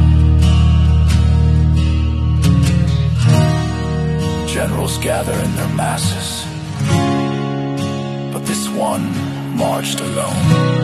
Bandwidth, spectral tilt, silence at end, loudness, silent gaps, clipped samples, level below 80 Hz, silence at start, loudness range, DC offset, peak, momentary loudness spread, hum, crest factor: 13 kHz; -6 dB/octave; 0 s; -16 LUFS; none; under 0.1%; -20 dBFS; 0 s; 5 LU; under 0.1%; 0 dBFS; 9 LU; none; 14 dB